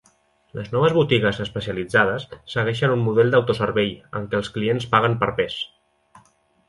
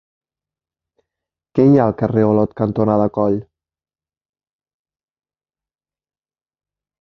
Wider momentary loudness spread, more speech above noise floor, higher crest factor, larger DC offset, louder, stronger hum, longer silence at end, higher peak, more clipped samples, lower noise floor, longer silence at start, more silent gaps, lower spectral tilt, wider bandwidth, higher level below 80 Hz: first, 12 LU vs 7 LU; second, 40 dB vs over 75 dB; about the same, 20 dB vs 20 dB; neither; second, -21 LUFS vs -16 LUFS; neither; second, 1 s vs 3.6 s; about the same, -2 dBFS vs -2 dBFS; neither; second, -61 dBFS vs under -90 dBFS; second, 0.55 s vs 1.55 s; neither; second, -6.5 dB/octave vs -11 dB/octave; first, 11.5 kHz vs 6 kHz; about the same, -52 dBFS vs -52 dBFS